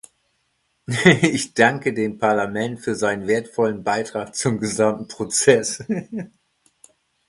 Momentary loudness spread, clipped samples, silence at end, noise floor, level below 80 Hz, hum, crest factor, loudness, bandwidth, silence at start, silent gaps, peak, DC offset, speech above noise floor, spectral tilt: 11 LU; under 0.1%; 1 s; -69 dBFS; -58 dBFS; none; 22 dB; -20 LUFS; 11.5 kHz; 0.9 s; none; 0 dBFS; under 0.1%; 49 dB; -4.5 dB/octave